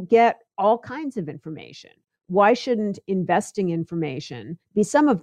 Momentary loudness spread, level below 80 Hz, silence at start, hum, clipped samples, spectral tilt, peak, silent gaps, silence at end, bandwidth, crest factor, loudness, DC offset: 18 LU; -68 dBFS; 0 s; none; under 0.1%; -6 dB/octave; -6 dBFS; none; 0 s; 12 kHz; 16 dB; -22 LUFS; under 0.1%